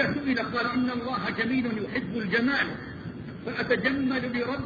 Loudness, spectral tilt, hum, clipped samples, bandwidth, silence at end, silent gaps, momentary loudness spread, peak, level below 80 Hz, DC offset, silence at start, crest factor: -28 LUFS; -7 dB/octave; none; under 0.1%; 7 kHz; 0 s; none; 12 LU; -10 dBFS; -54 dBFS; under 0.1%; 0 s; 18 dB